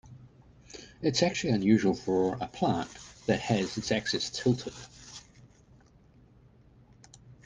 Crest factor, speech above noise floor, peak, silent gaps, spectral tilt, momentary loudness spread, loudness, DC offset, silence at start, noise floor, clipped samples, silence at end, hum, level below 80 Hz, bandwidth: 20 dB; 30 dB; -12 dBFS; none; -5 dB/octave; 22 LU; -29 LUFS; under 0.1%; 0.05 s; -59 dBFS; under 0.1%; 0.1 s; none; -60 dBFS; 10 kHz